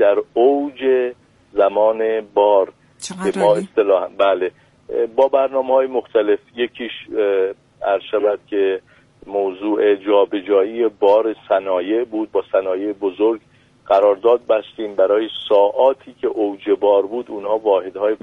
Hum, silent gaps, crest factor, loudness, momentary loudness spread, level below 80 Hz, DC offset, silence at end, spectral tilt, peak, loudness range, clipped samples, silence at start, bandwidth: none; none; 14 dB; -18 LUFS; 9 LU; -62 dBFS; under 0.1%; 0.05 s; -5 dB/octave; -2 dBFS; 2 LU; under 0.1%; 0 s; 11.5 kHz